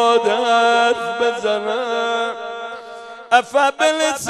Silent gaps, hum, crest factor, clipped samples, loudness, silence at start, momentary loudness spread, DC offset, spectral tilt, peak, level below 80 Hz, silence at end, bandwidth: none; none; 18 dB; under 0.1%; -17 LUFS; 0 s; 15 LU; under 0.1%; -2 dB/octave; 0 dBFS; -66 dBFS; 0 s; 13.5 kHz